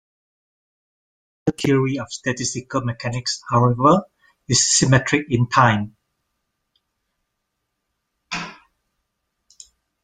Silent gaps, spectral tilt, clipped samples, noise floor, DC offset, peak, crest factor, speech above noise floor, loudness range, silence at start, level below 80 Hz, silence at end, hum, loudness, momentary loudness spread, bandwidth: none; -4 dB/octave; under 0.1%; -77 dBFS; under 0.1%; 0 dBFS; 22 dB; 58 dB; 20 LU; 1.45 s; -52 dBFS; 1.5 s; none; -19 LUFS; 14 LU; 10 kHz